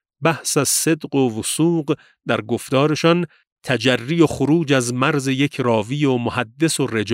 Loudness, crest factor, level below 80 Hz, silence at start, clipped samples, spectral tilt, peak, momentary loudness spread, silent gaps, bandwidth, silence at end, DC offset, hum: -19 LUFS; 16 dB; -56 dBFS; 0.2 s; under 0.1%; -4.5 dB/octave; -2 dBFS; 7 LU; 3.47-3.56 s; 16 kHz; 0 s; under 0.1%; none